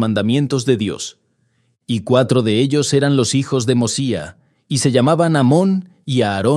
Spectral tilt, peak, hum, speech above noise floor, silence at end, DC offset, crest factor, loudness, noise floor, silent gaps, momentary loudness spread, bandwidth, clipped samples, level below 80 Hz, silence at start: -5.5 dB/octave; 0 dBFS; none; 47 dB; 0 s; under 0.1%; 16 dB; -16 LUFS; -63 dBFS; none; 9 LU; 12.5 kHz; under 0.1%; -58 dBFS; 0 s